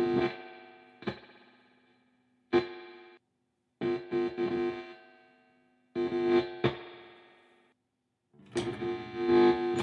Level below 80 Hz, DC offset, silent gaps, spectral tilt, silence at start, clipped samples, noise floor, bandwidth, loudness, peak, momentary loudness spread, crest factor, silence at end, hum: -68 dBFS; under 0.1%; none; -6.5 dB/octave; 0 s; under 0.1%; -81 dBFS; 9.8 kHz; -31 LUFS; -12 dBFS; 23 LU; 20 dB; 0 s; none